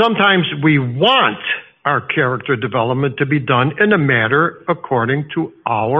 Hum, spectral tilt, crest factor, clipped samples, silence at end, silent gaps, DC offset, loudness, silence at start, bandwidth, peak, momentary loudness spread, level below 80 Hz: none; -3.5 dB/octave; 16 dB; under 0.1%; 0 s; none; under 0.1%; -16 LUFS; 0 s; 5.6 kHz; 0 dBFS; 8 LU; -56 dBFS